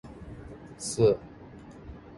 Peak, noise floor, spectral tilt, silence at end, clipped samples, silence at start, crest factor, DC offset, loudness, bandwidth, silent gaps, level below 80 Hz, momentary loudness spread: -10 dBFS; -47 dBFS; -5.5 dB/octave; 0 s; under 0.1%; 0.05 s; 20 dB; under 0.1%; -27 LUFS; 11.5 kHz; none; -52 dBFS; 23 LU